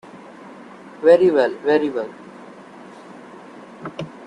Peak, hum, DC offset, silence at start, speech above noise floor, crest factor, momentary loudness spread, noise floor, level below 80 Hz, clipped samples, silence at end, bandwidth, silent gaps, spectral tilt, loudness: -2 dBFS; none; under 0.1%; 0.15 s; 25 dB; 20 dB; 27 LU; -41 dBFS; -66 dBFS; under 0.1%; 0 s; 9.8 kHz; none; -6.5 dB/octave; -17 LUFS